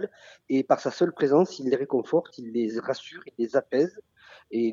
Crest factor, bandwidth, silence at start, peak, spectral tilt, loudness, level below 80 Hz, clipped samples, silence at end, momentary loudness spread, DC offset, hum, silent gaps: 18 dB; 7.6 kHz; 0 s; -8 dBFS; -6.5 dB/octave; -26 LUFS; -76 dBFS; under 0.1%; 0 s; 11 LU; under 0.1%; none; none